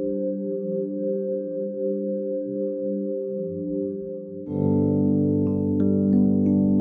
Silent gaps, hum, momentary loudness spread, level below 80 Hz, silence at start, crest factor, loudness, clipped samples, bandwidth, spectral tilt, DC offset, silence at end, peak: none; none; 9 LU; -60 dBFS; 0 s; 14 dB; -24 LUFS; under 0.1%; 1.7 kHz; -14 dB/octave; under 0.1%; 0 s; -10 dBFS